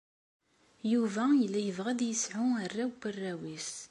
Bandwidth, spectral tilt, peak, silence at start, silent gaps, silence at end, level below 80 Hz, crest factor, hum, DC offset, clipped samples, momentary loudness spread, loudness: 11.5 kHz; -4 dB/octave; -18 dBFS; 0.85 s; none; 0.05 s; -78 dBFS; 14 dB; none; under 0.1%; under 0.1%; 11 LU; -32 LUFS